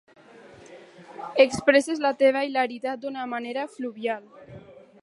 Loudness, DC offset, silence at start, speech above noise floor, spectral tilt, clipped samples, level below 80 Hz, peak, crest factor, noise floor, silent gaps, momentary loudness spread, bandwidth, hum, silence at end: -24 LUFS; under 0.1%; 0.45 s; 25 dB; -4 dB/octave; under 0.1%; -66 dBFS; -4 dBFS; 22 dB; -49 dBFS; none; 13 LU; 11.5 kHz; none; 0.25 s